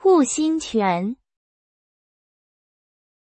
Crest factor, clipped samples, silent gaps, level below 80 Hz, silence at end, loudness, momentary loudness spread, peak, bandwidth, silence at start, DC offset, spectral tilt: 16 dB; under 0.1%; none; -62 dBFS; 2.1 s; -21 LUFS; 12 LU; -8 dBFS; 8.8 kHz; 0.05 s; under 0.1%; -4.5 dB/octave